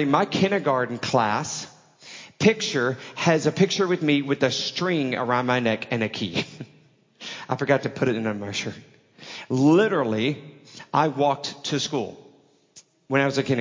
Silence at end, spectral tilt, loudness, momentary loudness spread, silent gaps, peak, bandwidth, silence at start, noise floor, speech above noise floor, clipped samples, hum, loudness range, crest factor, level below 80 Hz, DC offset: 0 s; -5 dB/octave; -23 LUFS; 15 LU; none; -4 dBFS; 7.6 kHz; 0 s; -56 dBFS; 33 dB; under 0.1%; none; 4 LU; 20 dB; -64 dBFS; under 0.1%